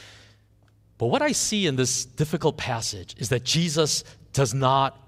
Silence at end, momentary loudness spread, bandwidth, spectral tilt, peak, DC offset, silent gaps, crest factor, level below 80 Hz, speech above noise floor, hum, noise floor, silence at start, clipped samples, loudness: 0.15 s; 7 LU; 16 kHz; -4 dB/octave; -6 dBFS; under 0.1%; none; 18 dB; -54 dBFS; 35 dB; none; -59 dBFS; 0 s; under 0.1%; -24 LUFS